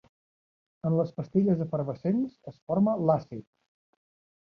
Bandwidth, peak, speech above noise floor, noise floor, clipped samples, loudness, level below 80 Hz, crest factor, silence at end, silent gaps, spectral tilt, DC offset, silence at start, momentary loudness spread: 6 kHz; -12 dBFS; over 63 dB; under -90 dBFS; under 0.1%; -28 LUFS; -66 dBFS; 18 dB; 1 s; 2.62-2.67 s; -11.5 dB/octave; under 0.1%; 0.85 s; 12 LU